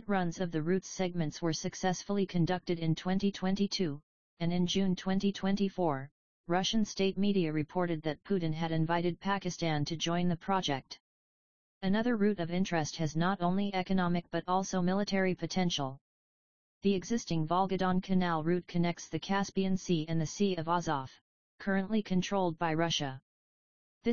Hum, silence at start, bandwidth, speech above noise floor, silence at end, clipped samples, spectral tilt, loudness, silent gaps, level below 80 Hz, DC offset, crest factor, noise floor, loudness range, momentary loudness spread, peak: none; 0 s; 7.2 kHz; over 58 dB; 0 s; under 0.1%; -5.5 dB/octave; -32 LUFS; 4.03-4.37 s, 6.11-6.44 s, 11.00-11.81 s, 16.01-16.81 s, 21.21-21.58 s, 23.22-24.01 s; -58 dBFS; 0.5%; 16 dB; under -90 dBFS; 2 LU; 5 LU; -16 dBFS